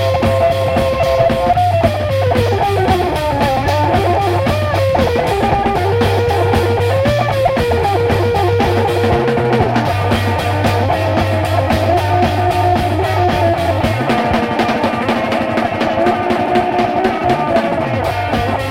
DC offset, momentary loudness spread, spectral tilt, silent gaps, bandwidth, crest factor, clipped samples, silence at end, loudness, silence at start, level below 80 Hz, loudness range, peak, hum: under 0.1%; 2 LU; -6.5 dB/octave; none; 16 kHz; 12 dB; under 0.1%; 0 s; -14 LUFS; 0 s; -32 dBFS; 1 LU; -2 dBFS; none